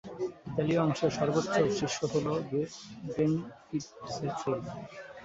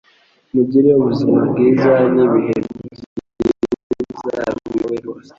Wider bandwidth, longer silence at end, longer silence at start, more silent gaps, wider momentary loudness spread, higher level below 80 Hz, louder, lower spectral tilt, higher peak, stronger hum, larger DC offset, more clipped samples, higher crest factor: about the same, 8 kHz vs 7.4 kHz; second, 0 s vs 0.2 s; second, 0.05 s vs 0.55 s; second, none vs 3.06-3.16 s, 3.83-3.90 s; second, 11 LU vs 15 LU; second, -62 dBFS vs -48 dBFS; second, -32 LUFS vs -16 LUFS; second, -6 dB/octave vs -8.5 dB/octave; second, -12 dBFS vs -2 dBFS; neither; neither; neither; about the same, 18 dB vs 14 dB